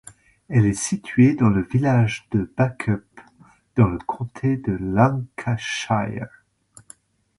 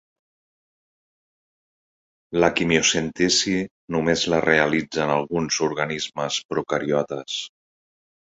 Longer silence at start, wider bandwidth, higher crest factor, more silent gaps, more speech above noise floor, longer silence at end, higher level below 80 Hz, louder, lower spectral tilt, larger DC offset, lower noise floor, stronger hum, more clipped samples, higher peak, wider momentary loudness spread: second, 0.5 s vs 2.3 s; first, 11.5 kHz vs 8.4 kHz; about the same, 18 dB vs 22 dB; second, none vs 3.71-3.88 s, 6.45-6.49 s; second, 34 dB vs over 68 dB; first, 1.1 s vs 0.8 s; first, -46 dBFS vs -54 dBFS; about the same, -21 LUFS vs -22 LUFS; first, -6.5 dB/octave vs -3.5 dB/octave; neither; second, -54 dBFS vs under -90 dBFS; neither; neither; about the same, -2 dBFS vs -2 dBFS; about the same, 11 LU vs 9 LU